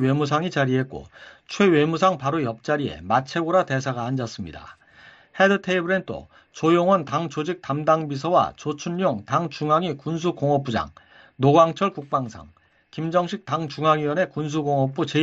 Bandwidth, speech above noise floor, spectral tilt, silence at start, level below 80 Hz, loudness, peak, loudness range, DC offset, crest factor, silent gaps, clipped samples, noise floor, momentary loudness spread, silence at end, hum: 7.8 kHz; 28 dB; -6.5 dB/octave; 0 s; -56 dBFS; -22 LUFS; -4 dBFS; 2 LU; under 0.1%; 18 dB; none; under 0.1%; -51 dBFS; 12 LU; 0 s; none